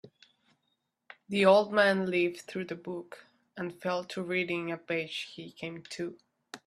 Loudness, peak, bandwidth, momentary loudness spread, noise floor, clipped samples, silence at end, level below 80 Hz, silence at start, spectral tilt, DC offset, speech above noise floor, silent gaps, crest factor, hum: -30 LUFS; -10 dBFS; 13 kHz; 18 LU; -80 dBFS; under 0.1%; 0.1 s; -76 dBFS; 0.05 s; -5.5 dB/octave; under 0.1%; 49 dB; none; 22 dB; none